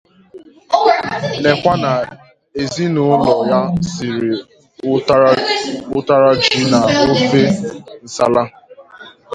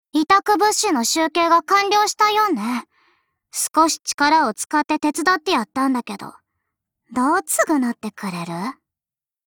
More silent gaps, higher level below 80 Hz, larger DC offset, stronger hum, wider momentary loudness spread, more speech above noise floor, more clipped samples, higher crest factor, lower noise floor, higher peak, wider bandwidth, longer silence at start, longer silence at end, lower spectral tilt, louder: second, none vs 4.14-4.18 s; first, -48 dBFS vs -62 dBFS; neither; neither; about the same, 12 LU vs 13 LU; second, 26 dB vs over 71 dB; neither; about the same, 16 dB vs 16 dB; second, -40 dBFS vs under -90 dBFS; first, 0 dBFS vs -4 dBFS; second, 10.5 kHz vs over 20 kHz; first, 0.35 s vs 0.15 s; second, 0 s vs 0.75 s; first, -5.5 dB/octave vs -2.5 dB/octave; first, -14 LUFS vs -19 LUFS